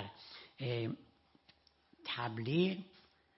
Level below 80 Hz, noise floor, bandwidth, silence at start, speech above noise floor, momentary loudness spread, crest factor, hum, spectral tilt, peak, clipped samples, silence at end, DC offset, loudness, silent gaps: -76 dBFS; -70 dBFS; 5.8 kHz; 0 s; 33 dB; 18 LU; 20 dB; none; -5 dB/octave; -20 dBFS; under 0.1%; 0.5 s; under 0.1%; -39 LUFS; none